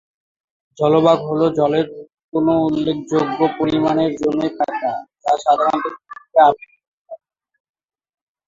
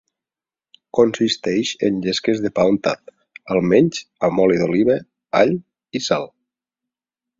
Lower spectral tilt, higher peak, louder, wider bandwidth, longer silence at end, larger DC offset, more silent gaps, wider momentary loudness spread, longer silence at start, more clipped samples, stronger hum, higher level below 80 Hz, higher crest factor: first, -7 dB/octave vs -5.5 dB/octave; about the same, 0 dBFS vs -2 dBFS; about the same, -18 LUFS vs -19 LUFS; about the same, 7.6 kHz vs 7.8 kHz; first, 1.3 s vs 1.1 s; neither; first, 2.24-2.29 s, 6.88-7.05 s vs none; first, 11 LU vs 8 LU; second, 0.8 s vs 0.95 s; neither; neither; about the same, -56 dBFS vs -56 dBFS; about the same, 18 dB vs 18 dB